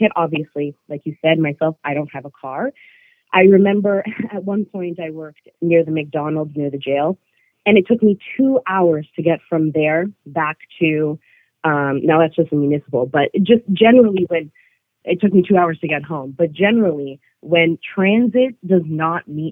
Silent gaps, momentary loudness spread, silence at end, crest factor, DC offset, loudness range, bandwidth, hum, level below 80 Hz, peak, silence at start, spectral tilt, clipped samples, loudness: none; 13 LU; 0 s; 16 dB; under 0.1%; 4 LU; 3.9 kHz; none; -64 dBFS; 0 dBFS; 0 s; -10 dB/octave; under 0.1%; -17 LUFS